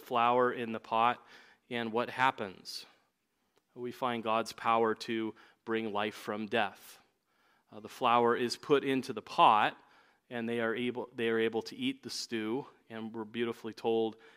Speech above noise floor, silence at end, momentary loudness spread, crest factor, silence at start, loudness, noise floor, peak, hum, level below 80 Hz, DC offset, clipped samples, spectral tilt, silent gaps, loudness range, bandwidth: 47 dB; 0.25 s; 15 LU; 22 dB; 0 s; -32 LUFS; -79 dBFS; -10 dBFS; none; -82 dBFS; under 0.1%; under 0.1%; -4.5 dB/octave; none; 5 LU; 16 kHz